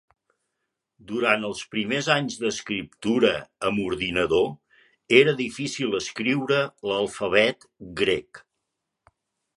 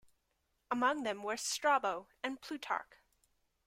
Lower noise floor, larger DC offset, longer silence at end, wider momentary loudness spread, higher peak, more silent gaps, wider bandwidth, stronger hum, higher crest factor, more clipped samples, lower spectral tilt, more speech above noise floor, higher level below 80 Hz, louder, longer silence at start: about the same, -81 dBFS vs -81 dBFS; neither; first, 1.2 s vs 0.85 s; about the same, 9 LU vs 10 LU; first, -2 dBFS vs -18 dBFS; neither; second, 11.5 kHz vs 16 kHz; neither; about the same, 24 dB vs 20 dB; neither; first, -4.5 dB/octave vs -1.5 dB/octave; first, 57 dB vs 44 dB; first, -58 dBFS vs -78 dBFS; first, -24 LUFS vs -36 LUFS; first, 1.1 s vs 0.7 s